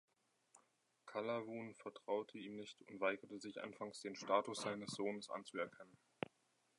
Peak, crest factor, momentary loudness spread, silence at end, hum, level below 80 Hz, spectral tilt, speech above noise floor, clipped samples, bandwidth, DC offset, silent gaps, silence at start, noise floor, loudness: -22 dBFS; 24 dB; 14 LU; 0.9 s; none; -88 dBFS; -4 dB/octave; 35 dB; under 0.1%; 11 kHz; under 0.1%; none; 0.55 s; -81 dBFS; -46 LUFS